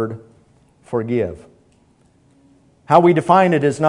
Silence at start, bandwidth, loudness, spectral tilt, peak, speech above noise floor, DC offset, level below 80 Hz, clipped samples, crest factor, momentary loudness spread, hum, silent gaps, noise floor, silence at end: 0 s; 11 kHz; -16 LUFS; -7.5 dB/octave; 0 dBFS; 40 dB; under 0.1%; -56 dBFS; under 0.1%; 18 dB; 14 LU; none; none; -55 dBFS; 0 s